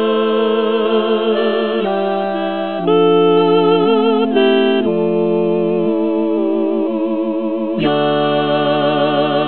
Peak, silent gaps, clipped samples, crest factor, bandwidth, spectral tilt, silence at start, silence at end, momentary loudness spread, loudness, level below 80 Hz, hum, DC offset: 0 dBFS; none; under 0.1%; 14 dB; 4.4 kHz; -10 dB/octave; 0 s; 0 s; 6 LU; -15 LUFS; -62 dBFS; none; 1%